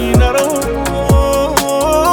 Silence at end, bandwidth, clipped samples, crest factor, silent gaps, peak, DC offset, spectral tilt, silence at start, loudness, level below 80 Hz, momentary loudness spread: 0 s; over 20 kHz; under 0.1%; 12 dB; none; 0 dBFS; under 0.1%; -5 dB/octave; 0 s; -13 LUFS; -20 dBFS; 5 LU